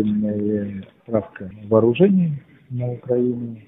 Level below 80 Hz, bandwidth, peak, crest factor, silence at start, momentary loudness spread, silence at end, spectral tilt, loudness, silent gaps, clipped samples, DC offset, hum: -54 dBFS; 3.8 kHz; -2 dBFS; 18 dB; 0 s; 17 LU; 0.05 s; -12 dB/octave; -21 LUFS; none; under 0.1%; under 0.1%; none